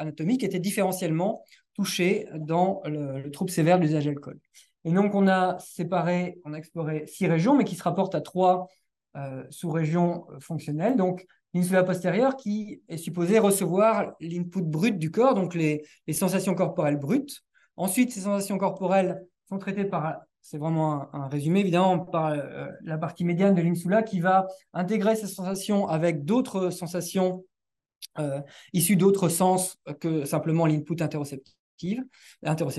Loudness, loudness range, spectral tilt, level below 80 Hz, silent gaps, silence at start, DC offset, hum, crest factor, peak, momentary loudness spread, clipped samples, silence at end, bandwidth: -26 LUFS; 3 LU; -6 dB/octave; -72 dBFS; 31.59-31.78 s; 0 s; under 0.1%; none; 16 dB; -10 dBFS; 15 LU; under 0.1%; 0 s; 12.5 kHz